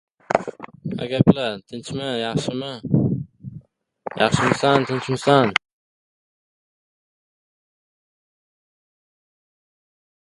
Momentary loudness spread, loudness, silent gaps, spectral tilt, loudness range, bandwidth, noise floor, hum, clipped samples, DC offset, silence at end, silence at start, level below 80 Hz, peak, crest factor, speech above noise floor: 18 LU; -21 LUFS; none; -6 dB/octave; 4 LU; 11.5 kHz; -47 dBFS; none; under 0.1%; under 0.1%; 4.7 s; 0.3 s; -52 dBFS; 0 dBFS; 24 dB; 27 dB